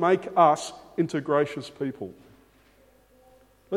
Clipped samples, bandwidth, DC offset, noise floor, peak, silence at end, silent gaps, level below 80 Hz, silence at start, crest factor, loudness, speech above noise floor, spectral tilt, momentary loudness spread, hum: under 0.1%; 13.5 kHz; under 0.1%; -59 dBFS; -6 dBFS; 0 s; none; -66 dBFS; 0 s; 20 dB; -25 LUFS; 34 dB; -6 dB/octave; 14 LU; none